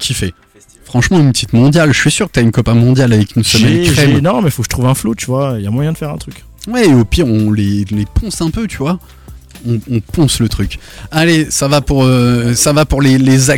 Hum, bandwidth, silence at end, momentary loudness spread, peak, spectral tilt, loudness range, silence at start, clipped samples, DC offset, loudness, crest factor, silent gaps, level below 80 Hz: none; 17 kHz; 0 s; 10 LU; 0 dBFS; -5 dB/octave; 6 LU; 0 s; under 0.1%; under 0.1%; -12 LUFS; 10 dB; none; -28 dBFS